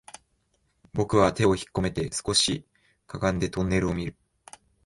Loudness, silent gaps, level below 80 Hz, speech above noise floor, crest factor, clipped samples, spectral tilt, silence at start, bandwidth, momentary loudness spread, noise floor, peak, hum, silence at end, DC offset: -26 LUFS; none; -46 dBFS; 46 dB; 20 dB; under 0.1%; -4.5 dB/octave; 0.95 s; 11.5 kHz; 12 LU; -71 dBFS; -8 dBFS; none; 0.75 s; under 0.1%